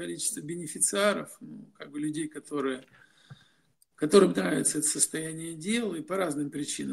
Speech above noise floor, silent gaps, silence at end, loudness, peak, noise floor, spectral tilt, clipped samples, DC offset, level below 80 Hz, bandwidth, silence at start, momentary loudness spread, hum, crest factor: 40 dB; none; 0 s; -28 LUFS; -6 dBFS; -68 dBFS; -3.5 dB/octave; under 0.1%; under 0.1%; -72 dBFS; 16 kHz; 0 s; 15 LU; none; 24 dB